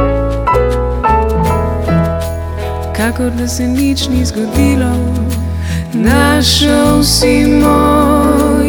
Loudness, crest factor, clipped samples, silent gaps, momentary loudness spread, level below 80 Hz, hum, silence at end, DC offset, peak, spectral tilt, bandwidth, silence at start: -12 LUFS; 12 dB; under 0.1%; none; 9 LU; -20 dBFS; none; 0 s; under 0.1%; 0 dBFS; -5 dB/octave; over 20 kHz; 0 s